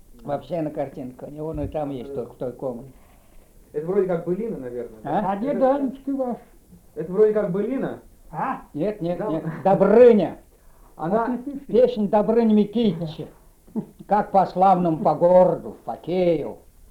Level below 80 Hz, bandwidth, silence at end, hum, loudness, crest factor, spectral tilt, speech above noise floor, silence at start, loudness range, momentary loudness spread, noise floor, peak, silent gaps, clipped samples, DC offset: -50 dBFS; 12.5 kHz; 0.35 s; none; -22 LUFS; 18 dB; -9 dB/octave; 29 dB; 0.25 s; 9 LU; 17 LU; -50 dBFS; -4 dBFS; none; under 0.1%; under 0.1%